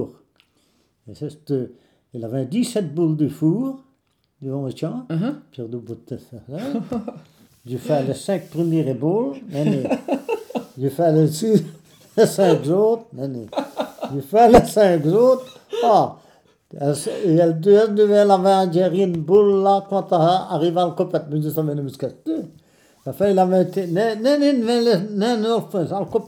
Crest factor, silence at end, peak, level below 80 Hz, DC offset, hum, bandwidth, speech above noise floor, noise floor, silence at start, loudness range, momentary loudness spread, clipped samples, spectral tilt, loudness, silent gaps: 20 dB; 0 s; 0 dBFS; -50 dBFS; under 0.1%; none; 17.5 kHz; 48 dB; -66 dBFS; 0 s; 10 LU; 17 LU; under 0.1%; -7 dB/octave; -19 LUFS; none